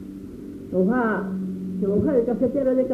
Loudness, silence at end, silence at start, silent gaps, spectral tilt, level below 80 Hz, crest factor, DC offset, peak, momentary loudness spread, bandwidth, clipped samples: -23 LUFS; 0 s; 0 s; none; -10 dB/octave; -50 dBFS; 14 dB; under 0.1%; -8 dBFS; 17 LU; 5.2 kHz; under 0.1%